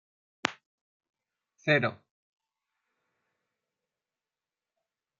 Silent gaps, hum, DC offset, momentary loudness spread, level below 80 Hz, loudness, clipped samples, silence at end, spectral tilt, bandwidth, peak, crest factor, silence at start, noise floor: 0.66-1.00 s; none; under 0.1%; 9 LU; -82 dBFS; -30 LUFS; under 0.1%; 3.25 s; -3.5 dB/octave; 7.2 kHz; -2 dBFS; 36 dB; 0.45 s; under -90 dBFS